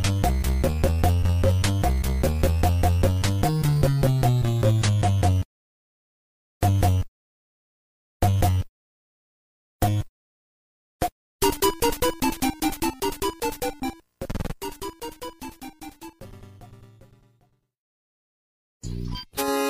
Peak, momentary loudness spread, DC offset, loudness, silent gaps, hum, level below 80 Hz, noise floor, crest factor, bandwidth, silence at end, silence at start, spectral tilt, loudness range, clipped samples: -6 dBFS; 16 LU; under 0.1%; -24 LUFS; 5.45-6.61 s, 7.08-8.20 s, 8.69-9.79 s, 10.09-10.99 s, 11.12-11.39 s, 17.78-18.80 s; none; -32 dBFS; -65 dBFS; 18 dB; 16 kHz; 0 s; 0 s; -5.5 dB/octave; 15 LU; under 0.1%